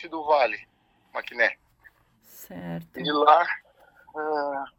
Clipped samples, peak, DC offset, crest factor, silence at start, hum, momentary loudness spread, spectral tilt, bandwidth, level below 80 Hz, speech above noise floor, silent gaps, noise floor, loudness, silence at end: under 0.1%; -4 dBFS; under 0.1%; 24 dB; 0 s; none; 21 LU; -5 dB/octave; over 20 kHz; -68 dBFS; 34 dB; none; -58 dBFS; -24 LUFS; 0.1 s